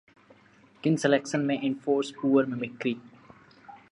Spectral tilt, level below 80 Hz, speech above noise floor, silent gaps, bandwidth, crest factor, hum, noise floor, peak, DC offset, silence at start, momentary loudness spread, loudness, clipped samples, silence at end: -6 dB/octave; -76 dBFS; 32 dB; none; 11 kHz; 20 dB; none; -58 dBFS; -8 dBFS; under 0.1%; 0.85 s; 8 LU; -27 LUFS; under 0.1%; 0.15 s